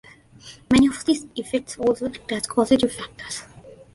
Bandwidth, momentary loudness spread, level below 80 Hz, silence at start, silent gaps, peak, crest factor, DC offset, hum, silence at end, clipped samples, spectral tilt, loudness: 11.5 kHz; 15 LU; -48 dBFS; 0.45 s; none; -2 dBFS; 22 dB; under 0.1%; none; 0.2 s; under 0.1%; -4.5 dB/octave; -22 LUFS